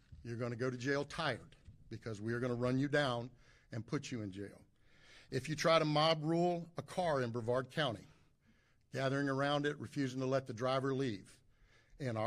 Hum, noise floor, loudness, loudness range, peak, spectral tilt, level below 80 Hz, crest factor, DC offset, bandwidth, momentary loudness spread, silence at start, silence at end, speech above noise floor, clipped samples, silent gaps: none; -71 dBFS; -37 LUFS; 4 LU; -18 dBFS; -5.5 dB/octave; -68 dBFS; 20 dB; under 0.1%; 14 kHz; 15 LU; 0.1 s; 0 s; 34 dB; under 0.1%; none